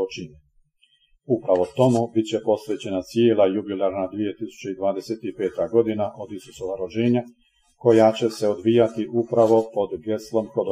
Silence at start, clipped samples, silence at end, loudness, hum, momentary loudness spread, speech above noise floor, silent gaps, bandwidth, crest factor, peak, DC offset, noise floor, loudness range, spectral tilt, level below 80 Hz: 0 s; under 0.1%; 0 s; -22 LUFS; none; 13 LU; 41 dB; none; 14.5 kHz; 18 dB; -4 dBFS; under 0.1%; -63 dBFS; 5 LU; -7 dB/octave; -62 dBFS